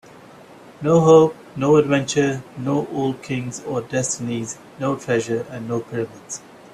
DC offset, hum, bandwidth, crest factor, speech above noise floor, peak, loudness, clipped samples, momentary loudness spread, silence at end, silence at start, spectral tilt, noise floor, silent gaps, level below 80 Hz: under 0.1%; none; 12.5 kHz; 18 dB; 24 dB; -2 dBFS; -20 LUFS; under 0.1%; 14 LU; 0.35 s; 0.8 s; -5.5 dB/octave; -44 dBFS; none; -58 dBFS